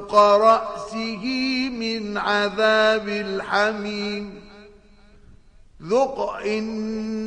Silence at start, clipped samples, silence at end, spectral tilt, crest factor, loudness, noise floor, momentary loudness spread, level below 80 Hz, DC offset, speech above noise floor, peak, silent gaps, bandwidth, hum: 0 s; under 0.1%; 0 s; -4.5 dB/octave; 18 dB; -21 LUFS; -50 dBFS; 12 LU; -52 dBFS; under 0.1%; 29 dB; -4 dBFS; none; 10 kHz; none